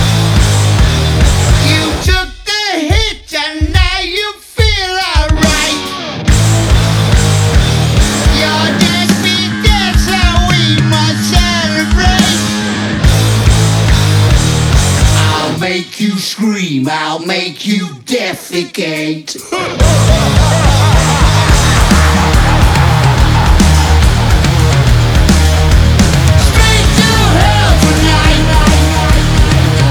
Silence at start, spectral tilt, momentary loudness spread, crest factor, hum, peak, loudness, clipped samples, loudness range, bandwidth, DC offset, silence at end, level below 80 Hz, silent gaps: 0 s; -4.5 dB/octave; 7 LU; 10 dB; none; 0 dBFS; -10 LUFS; 0.3%; 4 LU; over 20 kHz; under 0.1%; 0 s; -14 dBFS; none